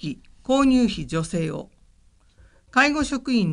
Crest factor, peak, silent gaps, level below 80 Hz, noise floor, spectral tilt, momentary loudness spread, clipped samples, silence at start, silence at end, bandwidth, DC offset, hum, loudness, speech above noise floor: 18 dB; -6 dBFS; none; -46 dBFS; -57 dBFS; -5 dB/octave; 14 LU; under 0.1%; 0 s; 0 s; 11 kHz; under 0.1%; none; -22 LUFS; 35 dB